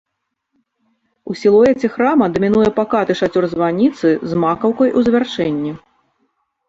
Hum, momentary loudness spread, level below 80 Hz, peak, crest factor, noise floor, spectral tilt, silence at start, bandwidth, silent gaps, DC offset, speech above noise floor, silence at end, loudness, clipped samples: none; 7 LU; -50 dBFS; -2 dBFS; 14 dB; -74 dBFS; -7 dB/octave; 1.25 s; 7.8 kHz; none; under 0.1%; 59 dB; 0.9 s; -15 LUFS; under 0.1%